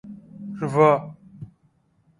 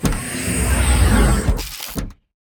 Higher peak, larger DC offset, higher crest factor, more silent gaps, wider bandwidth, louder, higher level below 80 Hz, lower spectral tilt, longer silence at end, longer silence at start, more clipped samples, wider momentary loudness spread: about the same, -4 dBFS vs -2 dBFS; neither; first, 22 dB vs 16 dB; neither; second, 11 kHz vs 20 kHz; about the same, -20 LUFS vs -19 LUFS; second, -62 dBFS vs -20 dBFS; first, -8 dB/octave vs -4.5 dB/octave; first, 0.75 s vs 0.4 s; about the same, 0.05 s vs 0 s; neither; first, 25 LU vs 13 LU